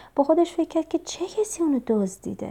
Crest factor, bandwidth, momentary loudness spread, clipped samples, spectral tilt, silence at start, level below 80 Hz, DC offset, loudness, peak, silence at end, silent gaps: 18 dB; 14.5 kHz; 9 LU; under 0.1%; -5.5 dB/octave; 0 s; -60 dBFS; under 0.1%; -25 LUFS; -8 dBFS; 0 s; none